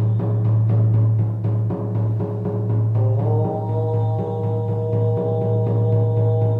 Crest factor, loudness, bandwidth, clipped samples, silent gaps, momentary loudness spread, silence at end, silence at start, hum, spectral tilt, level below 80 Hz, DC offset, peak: 10 dB; -20 LUFS; 2 kHz; under 0.1%; none; 5 LU; 0 s; 0 s; none; -12 dB/octave; -50 dBFS; under 0.1%; -8 dBFS